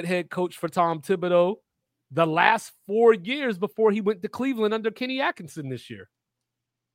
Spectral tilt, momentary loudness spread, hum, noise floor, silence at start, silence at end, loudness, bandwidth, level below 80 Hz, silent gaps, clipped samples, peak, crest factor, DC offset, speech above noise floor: -5.5 dB/octave; 15 LU; none; -84 dBFS; 0 s; 0.9 s; -24 LUFS; 16 kHz; -74 dBFS; none; under 0.1%; -2 dBFS; 24 dB; under 0.1%; 60 dB